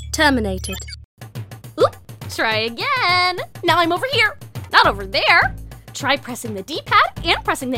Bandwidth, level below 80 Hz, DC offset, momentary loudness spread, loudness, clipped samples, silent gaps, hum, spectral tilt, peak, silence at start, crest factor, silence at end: 17.5 kHz; -38 dBFS; under 0.1%; 20 LU; -18 LUFS; under 0.1%; 1.05-1.17 s; none; -3.5 dB/octave; 0 dBFS; 0 s; 20 dB; 0 s